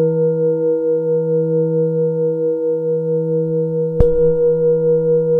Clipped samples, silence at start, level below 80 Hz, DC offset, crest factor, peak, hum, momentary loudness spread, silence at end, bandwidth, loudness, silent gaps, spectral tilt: under 0.1%; 0 s; -32 dBFS; under 0.1%; 16 dB; 0 dBFS; none; 4 LU; 0 s; 1.7 kHz; -16 LUFS; none; -12.5 dB/octave